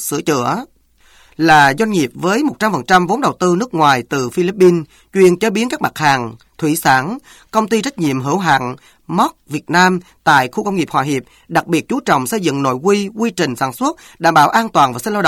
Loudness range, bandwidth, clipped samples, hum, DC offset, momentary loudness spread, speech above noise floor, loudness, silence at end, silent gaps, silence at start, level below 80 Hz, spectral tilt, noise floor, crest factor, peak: 3 LU; 17 kHz; under 0.1%; none; under 0.1%; 9 LU; 34 dB; -15 LUFS; 0 s; none; 0 s; -52 dBFS; -4.5 dB/octave; -49 dBFS; 14 dB; 0 dBFS